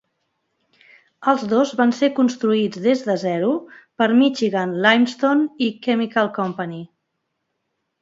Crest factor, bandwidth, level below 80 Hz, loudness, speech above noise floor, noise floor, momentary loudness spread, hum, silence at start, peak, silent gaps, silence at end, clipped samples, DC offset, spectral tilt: 20 dB; 7.8 kHz; -70 dBFS; -19 LUFS; 57 dB; -75 dBFS; 9 LU; none; 1.2 s; 0 dBFS; none; 1.15 s; under 0.1%; under 0.1%; -5.5 dB/octave